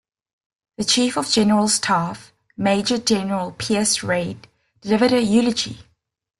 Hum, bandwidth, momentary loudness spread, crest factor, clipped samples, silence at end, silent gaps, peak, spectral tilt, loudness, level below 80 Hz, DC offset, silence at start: none; 12.5 kHz; 12 LU; 16 dB; under 0.1%; 0.55 s; none; -4 dBFS; -3.5 dB/octave; -19 LUFS; -56 dBFS; under 0.1%; 0.8 s